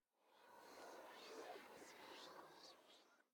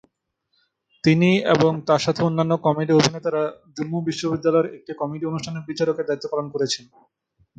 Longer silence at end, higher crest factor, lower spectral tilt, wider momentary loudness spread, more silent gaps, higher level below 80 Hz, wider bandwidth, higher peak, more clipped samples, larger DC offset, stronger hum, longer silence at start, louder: second, 0.1 s vs 0.8 s; about the same, 18 dB vs 18 dB; second, -2 dB/octave vs -5.5 dB/octave; about the same, 9 LU vs 11 LU; neither; second, under -90 dBFS vs -58 dBFS; first, 19 kHz vs 9 kHz; second, -44 dBFS vs -4 dBFS; neither; neither; neither; second, 0.15 s vs 1.05 s; second, -60 LUFS vs -22 LUFS